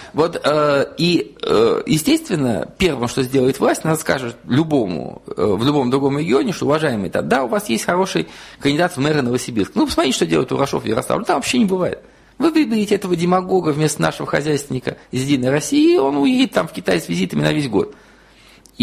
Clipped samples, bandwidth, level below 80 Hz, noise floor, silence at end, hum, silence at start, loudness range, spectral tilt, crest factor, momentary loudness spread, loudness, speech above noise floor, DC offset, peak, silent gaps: under 0.1%; 15.5 kHz; -46 dBFS; -47 dBFS; 0 s; none; 0 s; 1 LU; -5 dB/octave; 16 dB; 6 LU; -18 LUFS; 30 dB; under 0.1%; -2 dBFS; none